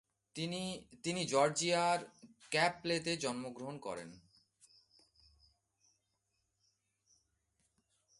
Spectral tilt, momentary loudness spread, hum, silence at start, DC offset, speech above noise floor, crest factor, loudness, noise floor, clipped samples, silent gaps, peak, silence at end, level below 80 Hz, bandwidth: -3.5 dB/octave; 14 LU; none; 0.35 s; under 0.1%; 47 dB; 24 dB; -36 LUFS; -83 dBFS; under 0.1%; none; -16 dBFS; 4 s; -76 dBFS; 11.5 kHz